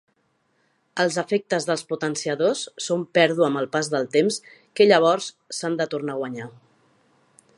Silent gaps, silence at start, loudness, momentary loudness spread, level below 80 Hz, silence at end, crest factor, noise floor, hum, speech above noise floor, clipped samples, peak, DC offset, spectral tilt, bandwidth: none; 0.95 s; -22 LUFS; 14 LU; -78 dBFS; 1.1 s; 22 dB; -68 dBFS; none; 46 dB; under 0.1%; -2 dBFS; under 0.1%; -4 dB/octave; 11.5 kHz